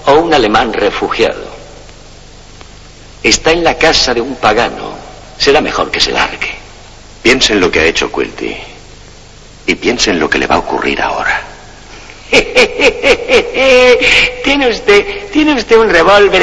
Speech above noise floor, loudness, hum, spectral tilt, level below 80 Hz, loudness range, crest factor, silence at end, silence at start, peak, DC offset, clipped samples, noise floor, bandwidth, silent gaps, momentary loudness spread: 25 dB; -10 LUFS; none; -3 dB/octave; -30 dBFS; 6 LU; 12 dB; 0 s; 0 s; 0 dBFS; under 0.1%; 0.7%; -35 dBFS; 11 kHz; none; 13 LU